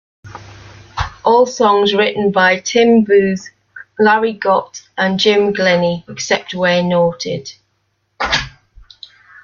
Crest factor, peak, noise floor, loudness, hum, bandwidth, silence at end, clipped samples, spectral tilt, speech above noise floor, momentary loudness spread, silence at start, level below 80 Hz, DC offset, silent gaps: 14 dB; 0 dBFS; -65 dBFS; -14 LUFS; none; 7.2 kHz; 0.95 s; under 0.1%; -4.5 dB/octave; 51 dB; 15 LU; 0.25 s; -42 dBFS; under 0.1%; none